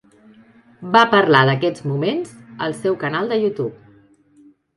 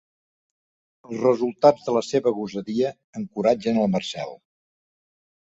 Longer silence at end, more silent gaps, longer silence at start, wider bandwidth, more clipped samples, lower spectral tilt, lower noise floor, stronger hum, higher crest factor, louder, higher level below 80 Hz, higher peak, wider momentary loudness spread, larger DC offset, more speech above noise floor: second, 1 s vs 1.15 s; second, none vs 3.04-3.13 s; second, 0.8 s vs 1.1 s; first, 11.5 kHz vs 8 kHz; neither; about the same, -6.5 dB/octave vs -6 dB/octave; second, -52 dBFS vs under -90 dBFS; neither; about the same, 20 dB vs 22 dB; first, -18 LUFS vs -23 LUFS; about the same, -62 dBFS vs -64 dBFS; about the same, 0 dBFS vs -2 dBFS; about the same, 14 LU vs 15 LU; neither; second, 34 dB vs over 68 dB